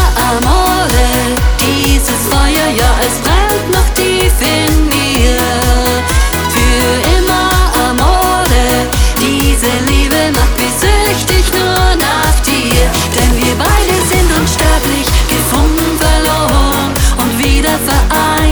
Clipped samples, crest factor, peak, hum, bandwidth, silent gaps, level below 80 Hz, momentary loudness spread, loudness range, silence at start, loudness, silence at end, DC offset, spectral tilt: under 0.1%; 10 dB; 0 dBFS; none; over 20 kHz; none; -14 dBFS; 2 LU; 0 LU; 0 s; -10 LUFS; 0 s; under 0.1%; -4 dB/octave